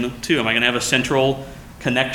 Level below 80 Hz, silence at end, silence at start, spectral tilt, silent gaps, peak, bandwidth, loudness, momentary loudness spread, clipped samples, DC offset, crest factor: -44 dBFS; 0 s; 0 s; -3.5 dB/octave; none; -2 dBFS; 18.5 kHz; -19 LUFS; 11 LU; under 0.1%; under 0.1%; 18 dB